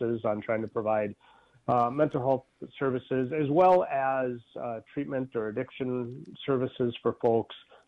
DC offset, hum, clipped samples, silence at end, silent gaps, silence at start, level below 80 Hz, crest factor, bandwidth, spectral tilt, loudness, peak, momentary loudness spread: under 0.1%; none; under 0.1%; 0.3 s; none; 0 s; -66 dBFS; 16 dB; 6.4 kHz; -9 dB/octave; -29 LUFS; -12 dBFS; 13 LU